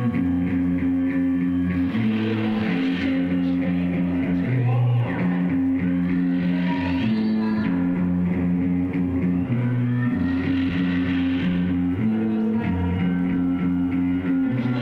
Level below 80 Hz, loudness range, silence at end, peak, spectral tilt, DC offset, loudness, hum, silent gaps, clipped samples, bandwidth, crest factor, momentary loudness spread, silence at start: -48 dBFS; 1 LU; 0 s; -12 dBFS; -9.5 dB/octave; under 0.1%; -22 LUFS; none; none; under 0.1%; 5 kHz; 10 dB; 1 LU; 0 s